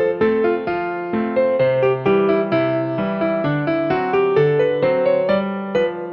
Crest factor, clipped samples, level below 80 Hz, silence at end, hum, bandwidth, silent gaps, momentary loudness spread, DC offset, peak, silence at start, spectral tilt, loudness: 14 dB; under 0.1%; -54 dBFS; 0 s; none; 6.4 kHz; none; 5 LU; under 0.1%; -4 dBFS; 0 s; -5.5 dB/octave; -18 LUFS